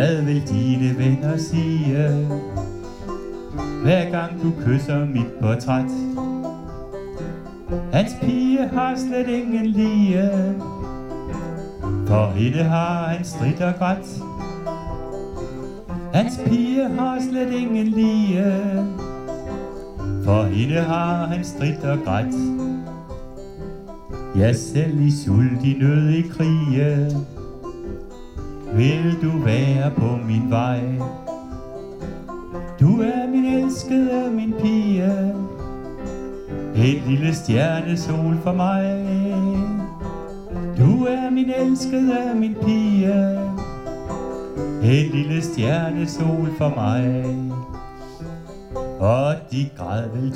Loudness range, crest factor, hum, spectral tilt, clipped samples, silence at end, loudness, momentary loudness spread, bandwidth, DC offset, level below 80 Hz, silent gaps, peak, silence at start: 4 LU; 16 dB; none; -7.5 dB/octave; under 0.1%; 0 s; -21 LUFS; 15 LU; 11 kHz; under 0.1%; -40 dBFS; none; -4 dBFS; 0 s